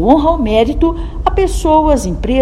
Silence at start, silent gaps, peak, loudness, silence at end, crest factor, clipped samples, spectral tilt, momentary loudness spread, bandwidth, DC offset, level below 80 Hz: 0 s; none; 0 dBFS; -13 LUFS; 0 s; 12 dB; 0.2%; -6.5 dB/octave; 6 LU; 13.5 kHz; under 0.1%; -20 dBFS